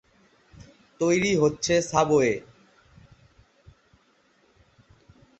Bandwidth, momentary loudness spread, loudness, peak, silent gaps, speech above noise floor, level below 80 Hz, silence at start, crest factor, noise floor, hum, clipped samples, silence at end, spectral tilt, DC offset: 8.4 kHz; 6 LU; -23 LUFS; -6 dBFS; none; 41 dB; -56 dBFS; 1 s; 22 dB; -64 dBFS; none; under 0.1%; 3 s; -4.5 dB/octave; under 0.1%